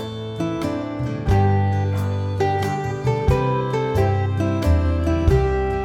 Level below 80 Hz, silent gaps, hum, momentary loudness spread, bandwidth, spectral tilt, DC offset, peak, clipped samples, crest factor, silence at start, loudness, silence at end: -28 dBFS; none; none; 7 LU; 12.5 kHz; -8 dB/octave; under 0.1%; -6 dBFS; under 0.1%; 14 dB; 0 s; -21 LUFS; 0 s